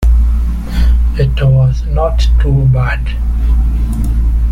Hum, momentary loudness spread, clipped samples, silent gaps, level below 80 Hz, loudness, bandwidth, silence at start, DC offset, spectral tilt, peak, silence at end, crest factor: none; 6 LU; under 0.1%; none; -12 dBFS; -13 LUFS; 6.8 kHz; 0 s; under 0.1%; -7.5 dB/octave; -2 dBFS; 0 s; 8 dB